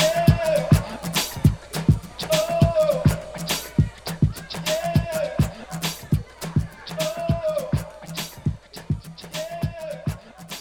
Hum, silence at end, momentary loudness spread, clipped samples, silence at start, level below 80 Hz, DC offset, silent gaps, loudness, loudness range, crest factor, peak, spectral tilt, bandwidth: none; 0 s; 12 LU; under 0.1%; 0 s; -36 dBFS; under 0.1%; none; -24 LUFS; 7 LU; 20 dB; -4 dBFS; -5.5 dB/octave; 19 kHz